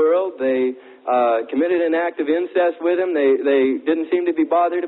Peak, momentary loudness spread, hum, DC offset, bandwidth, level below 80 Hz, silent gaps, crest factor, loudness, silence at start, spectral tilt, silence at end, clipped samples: -6 dBFS; 4 LU; none; under 0.1%; 4.1 kHz; -68 dBFS; none; 12 dB; -19 LUFS; 0 s; -9.5 dB/octave; 0 s; under 0.1%